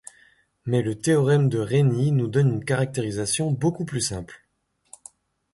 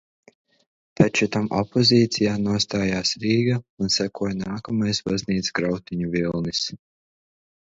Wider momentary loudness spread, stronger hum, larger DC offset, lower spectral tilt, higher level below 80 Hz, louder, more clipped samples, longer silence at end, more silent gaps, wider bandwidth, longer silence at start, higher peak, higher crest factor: about the same, 7 LU vs 8 LU; neither; neither; about the same, -6 dB/octave vs -5 dB/octave; about the same, -54 dBFS vs -52 dBFS; about the same, -23 LUFS vs -22 LUFS; neither; first, 1.2 s vs 0.9 s; second, none vs 3.69-3.77 s; first, 11.5 kHz vs 8 kHz; second, 0.65 s vs 1 s; second, -8 dBFS vs 0 dBFS; second, 14 dB vs 22 dB